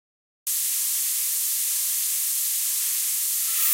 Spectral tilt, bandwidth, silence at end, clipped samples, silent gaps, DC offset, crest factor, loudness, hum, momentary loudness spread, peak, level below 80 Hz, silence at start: 11.5 dB/octave; 16 kHz; 0 s; under 0.1%; none; under 0.1%; 18 dB; -22 LUFS; none; 1 LU; -8 dBFS; under -90 dBFS; 0.45 s